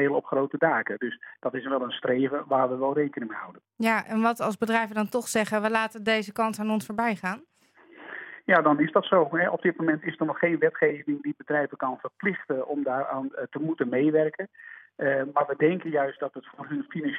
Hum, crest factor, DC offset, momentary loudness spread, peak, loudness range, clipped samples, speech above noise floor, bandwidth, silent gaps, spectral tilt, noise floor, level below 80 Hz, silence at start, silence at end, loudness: none; 20 dB; under 0.1%; 12 LU; -6 dBFS; 4 LU; under 0.1%; 29 dB; 16.5 kHz; none; -5.5 dB/octave; -56 dBFS; -78 dBFS; 0 s; 0 s; -26 LUFS